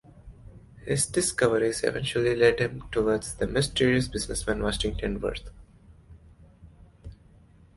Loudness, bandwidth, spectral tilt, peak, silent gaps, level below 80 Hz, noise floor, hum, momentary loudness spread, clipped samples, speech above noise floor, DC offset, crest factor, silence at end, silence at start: -26 LUFS; 12 kHz; -4 dB/octave; -8 dBFS; none; -42 dBFS; -55 dBFS; none; 8 LU; under 0.1%; 29 dB; under 0.1%; 20 dB; 0.65 s; 0.25 s